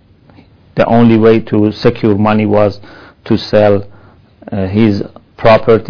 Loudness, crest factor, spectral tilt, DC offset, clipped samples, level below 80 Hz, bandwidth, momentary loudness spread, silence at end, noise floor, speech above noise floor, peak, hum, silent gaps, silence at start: -11 LUFS; 12 dB; -9 dB/octave; under 0.1%; 2%; -38 dBFS; 5.4 kHz; 12 LU; 0 s; -43 dBFS; 33 dB; 0 dBFS; none; none; 0.75 s